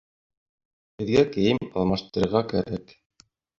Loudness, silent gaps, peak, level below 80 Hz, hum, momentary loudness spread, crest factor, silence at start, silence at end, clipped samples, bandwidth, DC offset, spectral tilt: -24 LUFS; none; -6 dBFS; -50 dBFS; none; 12 LU; 20 dB; 1 s; 0.75 s; under 0.1%; 7.6 kHz; under 0.1%; -7 dB/octave